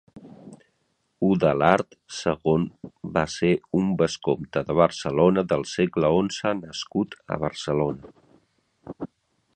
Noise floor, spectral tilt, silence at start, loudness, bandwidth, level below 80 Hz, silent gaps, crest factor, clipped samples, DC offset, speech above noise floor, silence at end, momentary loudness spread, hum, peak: -72 dBFS; -6 dB/octave; 0.15 s; -24 LUFS; 9.2 kHz; -52 dBFS; none; 24 dB; under 0.1%; under 0.1%; 48 dB; 0.5 s; 13 LU; none; -2 dBFS